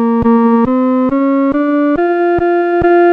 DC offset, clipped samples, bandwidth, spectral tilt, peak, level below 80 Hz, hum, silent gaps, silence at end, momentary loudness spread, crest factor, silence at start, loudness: 0.1%; under 0.1%; 4.6 kHz; -9.5 dB/octave; -2 dBFS; -38 dBFS; none; none; 0 s; 3 LU; 8 dB; 0 s; -12 LUFS